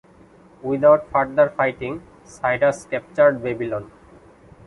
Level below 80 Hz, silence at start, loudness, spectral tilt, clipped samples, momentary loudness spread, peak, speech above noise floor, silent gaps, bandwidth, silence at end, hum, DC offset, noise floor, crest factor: -54 dBFS; 0.65 s; -20 LUFS; -6.5 dB/octave; under 0.1%; 15 LU; -2 dBFS; 30 dB; none; 11 kHz; 0.8 s; none; under 0.1%; -49 dBFS; 18 dB